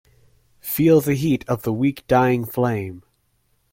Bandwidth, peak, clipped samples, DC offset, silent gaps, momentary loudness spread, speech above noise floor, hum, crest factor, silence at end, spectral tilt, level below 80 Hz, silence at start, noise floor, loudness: 16.5 kHz; -4 dBFS; under 0.1%; under 0.1%; none; 11 LU; 46 dB; none; 16 dB; 0.75 s; -7 dB/octave; -52 dBFS; 0.65 s; -65 dBFS; -20 LUFS